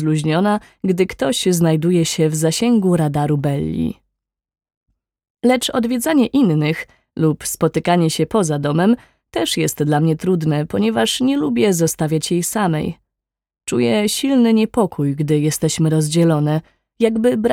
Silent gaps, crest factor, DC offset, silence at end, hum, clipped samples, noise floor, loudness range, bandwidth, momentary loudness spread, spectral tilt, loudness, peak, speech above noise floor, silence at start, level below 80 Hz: 4.77-4.81 s, 5.30-5.35 s; 16 dB; under 0.1%; 0 s; none; under 0.1%; -84 dBFS; 3 LU; 16.5 kHz; 6 LU; -5.5 dB/octave; -17 LUFS; -2 dBFS; 67 dB; 0 s; -50 dBFS